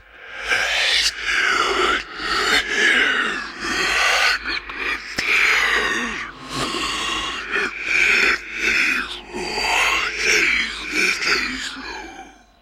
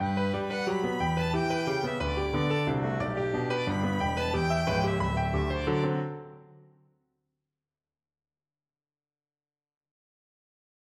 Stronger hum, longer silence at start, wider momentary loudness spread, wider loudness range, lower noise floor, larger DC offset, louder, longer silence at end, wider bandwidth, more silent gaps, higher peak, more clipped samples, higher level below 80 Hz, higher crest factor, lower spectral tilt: neither; first, 0.15 s vs 0 s; first, 11 LU vs 3 LU; second, 2 LU vs 7 LU; second, -42 dBFS vs under -90 dBFS; neither; first, -18 LUFS vs -29 LUFS; second, 0.3 s vs 4.5 s; first, 16 kHz vs 13.5 kHz; neither; first, -4 dBFS vs -14 dBFS; neither; about the same, -46 dBFS vs -44 dBFS; about the same, 16 dB vs 16 dB; second, -0.5 dB/octave vs -6.5 dB/octave